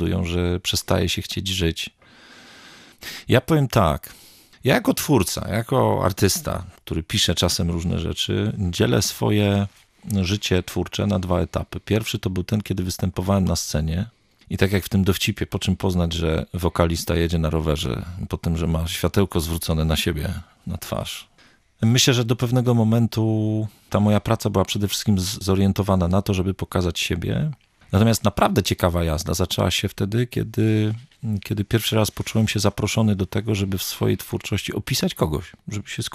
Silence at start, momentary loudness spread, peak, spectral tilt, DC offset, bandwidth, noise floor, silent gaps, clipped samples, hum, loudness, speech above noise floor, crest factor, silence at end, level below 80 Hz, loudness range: 0 s; 9 LU; -2 dBFS; -5 dB/octave; under 0.1%; 15.5 kHz; -56 dBFS; none; under 0.1%; none; -22 LUFS; 35 dB; 20 dB; 0 s; -40 dBFS; 3 LU